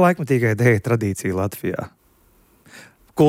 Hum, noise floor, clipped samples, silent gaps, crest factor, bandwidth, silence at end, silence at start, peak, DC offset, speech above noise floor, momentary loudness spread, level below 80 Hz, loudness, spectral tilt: none; -57 dBFS; under 0.1%; none; 16 dB; 16 kHz; 0 s; 0 s; -4 dBFS; under 0.1%; 38 dB; 14 LU; -56 dBFS; -20 LUFS; -7 dB/octave